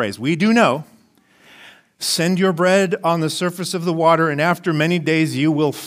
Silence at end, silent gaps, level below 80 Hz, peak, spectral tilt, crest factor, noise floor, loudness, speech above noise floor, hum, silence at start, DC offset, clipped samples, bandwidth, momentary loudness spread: 0 s; none; -66 dBFS; -2 dBFS; -5 dB/octave; 18 dB; -54 dBFS; -18 LUFS; 37 dB; none; 0 s; under 0.1%; under 0.1%; 16 kHz; 7 LU